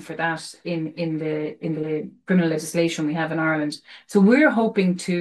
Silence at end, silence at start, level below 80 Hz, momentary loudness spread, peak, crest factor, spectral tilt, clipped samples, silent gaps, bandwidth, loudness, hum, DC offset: 0 s; 0 s; -68 dBFS; 12 LU; -6 dBFS; 16 dB; -6 dB/octave; under 0.1%; none; 12.5 kHz; -22 LUFS; none; under 0.1%